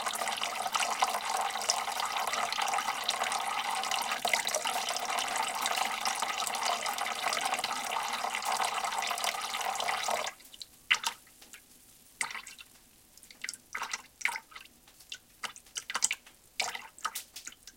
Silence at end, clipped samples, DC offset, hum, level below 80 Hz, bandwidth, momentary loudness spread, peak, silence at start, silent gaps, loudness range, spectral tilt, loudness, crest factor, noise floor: 0.05 s; under 0.1%; under 0.1%; none; -72 dBFS; 17 kHz; 15 LU; -8 dBFS; 0 s; none; 8 LU; 1 dB/octave; -32 LUFS; 28 dB; -60 dBFS